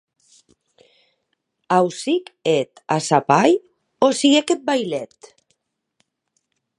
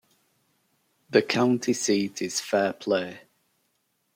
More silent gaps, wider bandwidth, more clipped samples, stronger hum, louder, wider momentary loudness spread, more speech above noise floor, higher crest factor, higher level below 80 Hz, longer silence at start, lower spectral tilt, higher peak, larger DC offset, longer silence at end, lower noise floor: neither; second, 11.5 kHz vs 16.5 kHz; neither; neither; first, -19 LUFS vs -25 LUFS; first, 8 LU vs 5 LU; first, 55 dB vs 49 dB; about the same, 20 dB vs 22 dB; about the same, -72 dBFS vs -74 dBFS; first, 1.7 s vs 1.1 s; about the same, -4.5 dB/octave vs -4 dB/octave; first, 0 dBFS vs -6 dBFS; neither; first, 1.75 s vs 0.95 s; about the same, -73 dBFS vs -73 dBFS